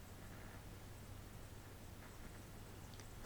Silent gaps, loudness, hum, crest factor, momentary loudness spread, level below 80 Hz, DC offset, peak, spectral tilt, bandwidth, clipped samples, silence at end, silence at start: none; -56 LUFS; none; 18 dB; 1 LU; -60 dBFS; under 0.1%; -36 dBFS; -4.5 dB/octave; over 20 kHz; under 0.1%; 0 s; 0 s